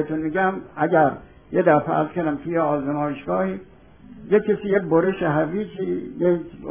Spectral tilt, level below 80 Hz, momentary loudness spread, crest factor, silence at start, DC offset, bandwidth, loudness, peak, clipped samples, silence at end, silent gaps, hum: -11.5 dB/octave; -54 dBFS; 8 LU; 18 dB; 0 s; 0.2%; 3.6 kHz; -22 LUFS; -4 dBFS; under 0.1%; 0 s; none; none